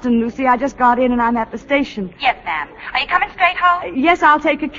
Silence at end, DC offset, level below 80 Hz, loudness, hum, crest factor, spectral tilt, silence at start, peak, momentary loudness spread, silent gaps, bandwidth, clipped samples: 0 s; under 0.1%; -44 dBFS; -16 LUFS; none; 16 dB; -5 dB/octave; 0 s; 0 dBFS; 9 LU; none; 7.6 kHz; under 0.1%